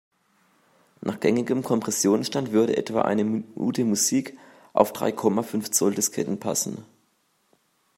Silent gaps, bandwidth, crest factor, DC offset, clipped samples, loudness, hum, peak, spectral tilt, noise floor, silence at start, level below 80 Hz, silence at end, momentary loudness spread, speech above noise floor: none; 16 kHz; 24 dB; under 0.1%; under 0.1%; -24 LUFS; none; -2 dBFS; -4 dB/octave; -68 dBFS; 1.05 s; -70 dBFS; 1.15 s; 6 LU; 44 dB